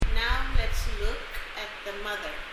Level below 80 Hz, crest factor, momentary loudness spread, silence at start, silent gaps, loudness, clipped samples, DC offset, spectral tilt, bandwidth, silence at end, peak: -28 dBFS; 16 dB; 8 LU; 0 s; none; -32 LUFS; under 0.1%; under 0.1%; -4 dB/octave; 15 kHz; 0 s; -12 dBFS